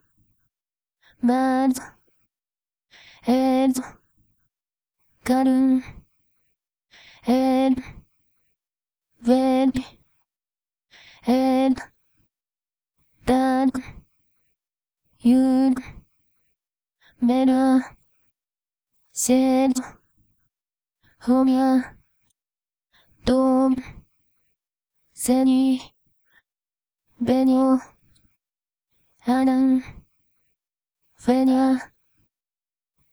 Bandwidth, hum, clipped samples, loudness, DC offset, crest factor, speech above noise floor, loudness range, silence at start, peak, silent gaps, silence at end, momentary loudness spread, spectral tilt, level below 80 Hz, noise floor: 16.5 kHz; none; under 0.1%; -21 LUFS; under 0.1%; 18 dB; over 71 dB; 4 LU; 1.25 s; -6 dBFS; none; 1.25 s; 13 LU; -5 dB/octave; -54 dBFS; under -90 dBFS